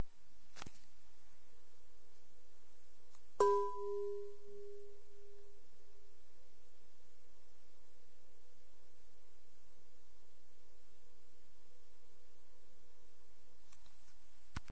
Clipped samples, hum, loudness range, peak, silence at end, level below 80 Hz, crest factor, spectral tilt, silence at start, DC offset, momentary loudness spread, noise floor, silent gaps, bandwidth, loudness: under 0.1%; none; 21 LU; -18 dBFS; 0.1 s; -72 dBFS; 28 dB; -5.5 dB/octave; 0 s; 1%; 24 LU; -72 dBFS; none; 8 kHz; -38 LUFS